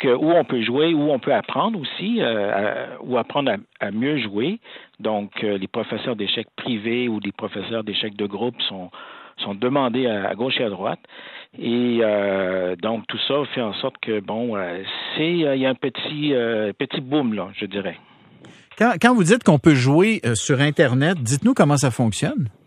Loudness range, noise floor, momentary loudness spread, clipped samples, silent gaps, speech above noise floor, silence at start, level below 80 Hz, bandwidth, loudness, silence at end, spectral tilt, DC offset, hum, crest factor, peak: 7 LU; -47 dBFS; 11 LU; under 0.1%; none; 26 dB; 0 s; -62 dBFS; 13 kHz; -21 LUFS; 0.15 s; -5.5 dB/octave; under 0.1%; none; 20 dB; 0 dBFS